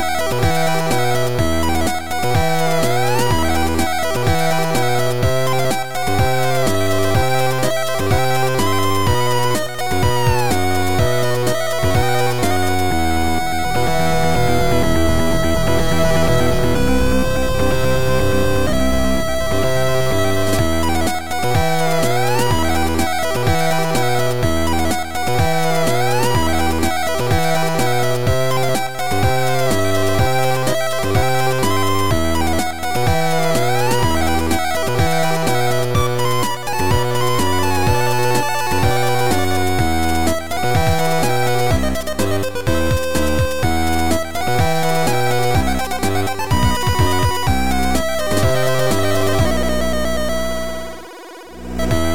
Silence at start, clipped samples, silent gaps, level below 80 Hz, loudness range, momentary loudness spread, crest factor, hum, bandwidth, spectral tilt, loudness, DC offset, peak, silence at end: 0 s; under 0.1%; none; -30 dBFS; 1 LU; 3 LU; 14 dB; none; 17 kHz; -5 dB/octave; -18 LUFS; 10%; -4 dBFS; 0 s